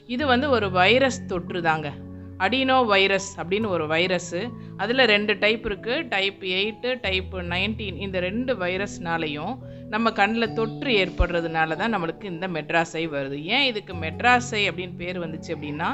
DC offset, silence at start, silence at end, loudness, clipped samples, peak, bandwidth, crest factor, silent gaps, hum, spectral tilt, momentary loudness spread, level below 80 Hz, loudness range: under 0.1%; 0.1 s; 0 s; -23 LUFS; under 0.1%; -4 dBFS; 8.4 kHz; 20 dB; none; none; -4.5 dB/octave; 12 LU; -42 dBFS; 4 LU